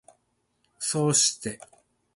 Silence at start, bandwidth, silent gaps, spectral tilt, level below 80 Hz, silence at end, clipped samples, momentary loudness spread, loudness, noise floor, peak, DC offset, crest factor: 0.8 s; 11.5 kHz; none; -3 dB/octave; -68 dBFS; 0.6 s; under 0.1%; 16 LU; -24 LUFS; -73 dBFS; -8 dBFS; under 0.1%; 20 dB